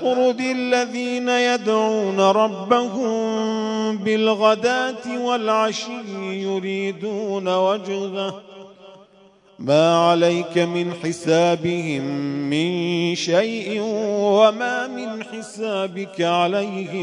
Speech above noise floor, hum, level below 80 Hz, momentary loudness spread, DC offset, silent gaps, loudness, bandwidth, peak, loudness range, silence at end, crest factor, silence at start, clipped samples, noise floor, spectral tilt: 32 dB; none; -72 dBFS; 10 LU; under 0.1%; none; -20 LUFS; 11 kHz; -2 dBFS; 4 LU; 0 s; 18 dB; 0 s; under 0.1%; -52 dBFS; -5 dB/octave